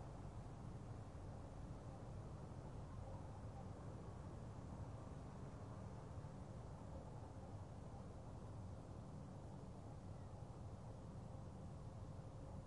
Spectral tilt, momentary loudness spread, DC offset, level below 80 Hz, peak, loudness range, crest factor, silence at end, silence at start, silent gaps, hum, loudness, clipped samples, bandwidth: -7.5 dB/octave; 2 LU; under 0.1%; -62 dBFS; -40 dBFS; 1 LU; 12 dB; 0 s; 0 s; none; none; -55 LUFS; under 0.1%; 11 kHz